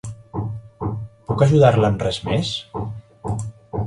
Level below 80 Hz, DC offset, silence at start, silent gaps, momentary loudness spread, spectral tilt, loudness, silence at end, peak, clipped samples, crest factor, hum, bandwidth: -42 dBFS; under 0.1%; 0.05 s; none; 17 LU; -7 dB/octave; -21 LUFS; 0 s; 0 dBFS; under 0.1%; 20 dB; none; 11 kHz